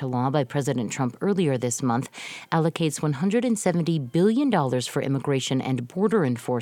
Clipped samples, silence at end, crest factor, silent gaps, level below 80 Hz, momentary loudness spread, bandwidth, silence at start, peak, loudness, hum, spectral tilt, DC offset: under 0.1%; 0 s; 16 dB; none; -66 dBFS; 5 LU; 17 kHz; 0 s; -6 dBFS; -24 LUFS; none; -6 dB/octave; under 0.1%